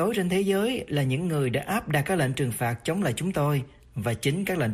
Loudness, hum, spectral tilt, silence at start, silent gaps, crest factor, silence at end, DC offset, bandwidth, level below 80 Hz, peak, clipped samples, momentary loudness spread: -26 LUFS; none; -6 dB/octave; 0 s; none; 14 dB; 0 s; under 0.1%; 15 kHz; -54 dBFS; -12 dBFS; under 0.1%; 4 LU